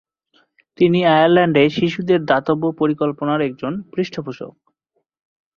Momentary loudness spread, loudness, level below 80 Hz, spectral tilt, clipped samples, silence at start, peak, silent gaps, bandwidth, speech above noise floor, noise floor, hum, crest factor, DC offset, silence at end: 13 LU; -17 LUFS; -58 dBFS; -7.5 dB/octave; under 0.1%; 0.8 s; -2 dBFS; none; 7 kHz; 55 dB; -71 dBFS; none; 18 dB; under 0.1%; 1.1 s